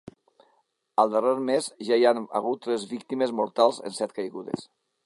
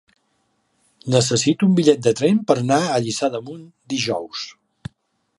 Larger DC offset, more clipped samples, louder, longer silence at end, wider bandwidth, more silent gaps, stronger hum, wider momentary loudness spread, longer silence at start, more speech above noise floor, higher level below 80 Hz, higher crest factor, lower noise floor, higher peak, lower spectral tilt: neither; neither; second, -26 LUFS vs -19 LUFS; second, 0.4 s vs 0.85 s; about the same, 11.5 kHz vs 11.5 kHz; neither; neither; second, 11 LU vs 23 LU; about the same, 1 s vs 1.05 s; second, 44 dB vs 49 dB; second, -74 dBFS vs -58 dBFS; about the same, 22 dB vs 20 dB; about the same, -69 dBFS vs -67 dBFS; second, -6 dBFS vs 0 dBFS; about the same, -4.5 dB/octave vs -5 dB/octave